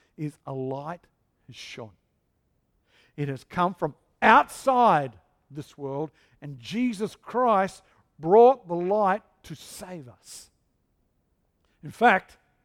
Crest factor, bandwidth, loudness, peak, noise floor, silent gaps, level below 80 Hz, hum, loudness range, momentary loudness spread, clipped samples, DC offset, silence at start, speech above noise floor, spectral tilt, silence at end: 24 dB; 15.5 kHz; -24 LUFS; -2 dBFS; -72 dBFS; none; -64 dBFS; none; 11 LU; 25 LU; under 0.1%; under 0.1%; 0.2 s; 48 dB; -5.5 dB/octave; 0.45 s